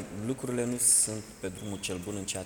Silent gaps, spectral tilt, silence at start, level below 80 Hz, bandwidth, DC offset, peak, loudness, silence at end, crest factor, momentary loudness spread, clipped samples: none; -3 dB/octave; 0 s; -58 dBFS; 20 kHz; under 0.1%; -10 dBFS; -28 LUFS; 0 s; 20 dB; 16 LU; under 0.1%